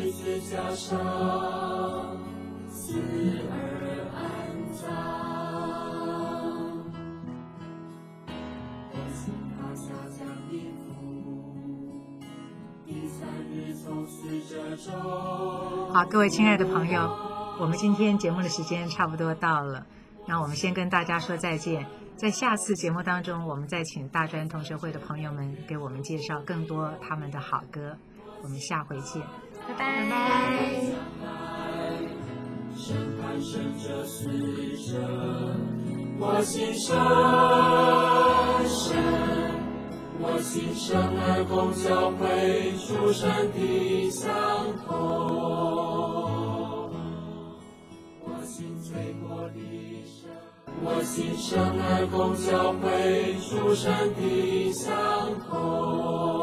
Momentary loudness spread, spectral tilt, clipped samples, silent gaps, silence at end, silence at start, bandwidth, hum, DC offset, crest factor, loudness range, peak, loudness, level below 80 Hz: 15 LU; -5.5 dB/octave; under 0.1%; none; 0 s; 0 s; 15.5 kHz; none; under 0.1%; 22 dB; 14 LU; -6 dBFS; -28 LUFS; -52 dBFS